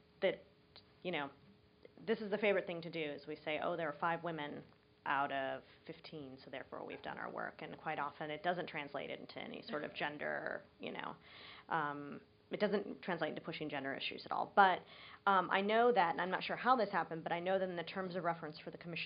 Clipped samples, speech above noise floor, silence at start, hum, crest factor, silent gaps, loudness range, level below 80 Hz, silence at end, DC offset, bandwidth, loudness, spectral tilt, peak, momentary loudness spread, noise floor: under 0.1%; 25 dB; 0.2 s; none; 26 dB; none; 9 LU; -80 dBFS; 0 s; under 0.1%; 5.2 kHz; -39 LUFS; -2.5 dB/octave; -14 dBFS; 16 LU; -64 dBFS